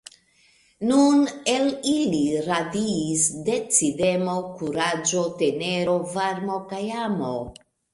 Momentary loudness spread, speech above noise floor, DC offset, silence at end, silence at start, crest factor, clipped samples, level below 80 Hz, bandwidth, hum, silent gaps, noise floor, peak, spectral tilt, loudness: 10 LU; 37 dB; under 0.1%; 0.4 s; 0.8 s; 18 dB; under 0.1%; -58 dBFS; 11.5 kHz; none; none; -60 dBFS; -6 dBFS; -4 dB/octave; -23 LUFS